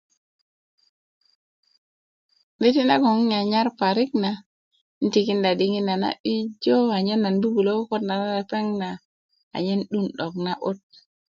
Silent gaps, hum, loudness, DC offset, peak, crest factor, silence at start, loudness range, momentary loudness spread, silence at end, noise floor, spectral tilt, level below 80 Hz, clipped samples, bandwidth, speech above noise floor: 4.46-4.71 s, 4.81-5.01 s, 6.20-6.24 s, 9.05-9.29 s, 9.43-9.51 s; none; -23 LUFS; under 0.1%; -6 dBFS; 18 dB; 2.6 s; 4 LU; 9 LU; 0.55 s; under -90 dBFS; -6.5 dB/octave; -70 dBFS; under 0.1%; 7.2 kHz; over 68 dB